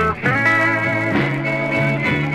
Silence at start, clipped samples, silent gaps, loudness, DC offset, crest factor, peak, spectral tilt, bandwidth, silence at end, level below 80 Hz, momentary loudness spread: 0 s; under 0.1%; none; -17 LUFS; 0.2%; 14 dB; -4 dBFS; -6.5 dB/octave; 13.5 kHz; 0 s; -44 dBFS; 5 LU